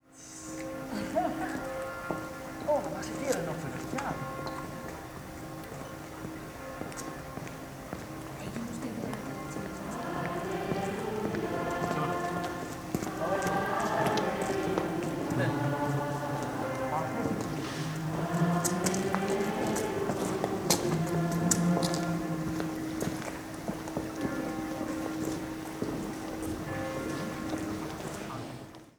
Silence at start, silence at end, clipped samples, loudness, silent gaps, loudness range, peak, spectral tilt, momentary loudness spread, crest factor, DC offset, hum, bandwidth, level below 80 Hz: 0.1 s; 0.1 s; under 0.1%; -33 LUFS; none; 9 LU; -6 dBFS; -5 dB/octave; 12 LU; 28 dB; under 0.1%; none; over 20 kHz; -54 dBFS